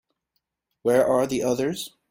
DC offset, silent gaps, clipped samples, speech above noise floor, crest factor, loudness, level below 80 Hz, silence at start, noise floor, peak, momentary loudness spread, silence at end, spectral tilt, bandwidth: under 0.1%; none; under 0.1%; 55 dB; 16 dB; -23 LUFS; -60 dBFS; 0.85 s; -78 dBFS; -8 dBFS; 9 LU; 0.2 s; -5 dB/octave; 16.5 kHz